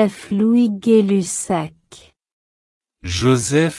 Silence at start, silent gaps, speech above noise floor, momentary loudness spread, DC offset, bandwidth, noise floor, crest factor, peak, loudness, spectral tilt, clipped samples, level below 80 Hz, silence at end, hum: 0 s; 2.32-2.81 s; 30 dB; 10 LU; under 0.1%; 12 kHz; -47 dBFS; 14 dB; -4 dBFS; -17 LUFS; -5.5 dB/octave; under 0.1%; -50 dBFS; 0 s; none